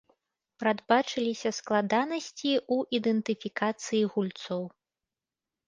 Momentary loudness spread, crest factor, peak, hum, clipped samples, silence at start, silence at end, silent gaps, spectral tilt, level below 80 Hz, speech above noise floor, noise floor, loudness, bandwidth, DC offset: 7 LU; 22 dB; -8 dBFS; none; under 0.1%; 0.6 s; 1 s; none; -4.5 dB/octave; -76 dBFS; over 61 dB; under -90 dBFS; -29 LUFS; 9.6 kHz; under 0.1%